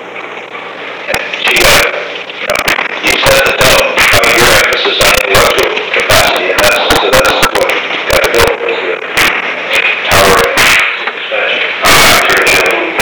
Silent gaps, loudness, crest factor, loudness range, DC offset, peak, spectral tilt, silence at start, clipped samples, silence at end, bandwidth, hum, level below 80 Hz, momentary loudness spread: none; -7 LUFS; 10 dB; 3 LU; 2%; 0 dBFS; -2 dB/octave; 0 s; 1%; 0 s; over 20 kHz; none; -30 dBFS; 10 LU